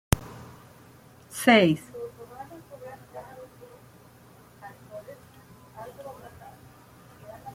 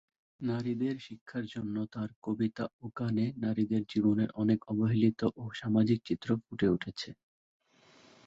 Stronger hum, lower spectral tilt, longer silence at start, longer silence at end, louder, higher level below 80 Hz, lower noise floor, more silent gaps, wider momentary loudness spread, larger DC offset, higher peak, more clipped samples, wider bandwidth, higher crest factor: neither; second, -5 dB/octave vs -8 dB/octave; second, 0.1 s vs 0.4 s; second, 0 s vs 1.15 s; first, -23 LUFS vs -33 LUFS; first, -48 dBFS vs -64 dBFS; second, -53 dBFS vs -62 dBFS; second, none vs 1.21-1.26 s, 2.16-2.22 s, 2.73-2.79 s; first, 29 LU vs 11 LU; neither; first, -2 dBFS vs -16 dBFS; neither; first, 16.5 kHz vs 7.6 kHz; first, 28 dB vs 18 dB